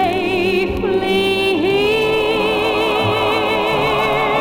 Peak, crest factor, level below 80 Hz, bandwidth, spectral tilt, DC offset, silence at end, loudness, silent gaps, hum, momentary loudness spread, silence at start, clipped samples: -4 dBFS; 12 dB; -40 dBFS; 17 kHz; -5 dB/octave; under 0.1%; 0 s; -16 LUFS; none; none; 2 LU; 0 s; under 0.1%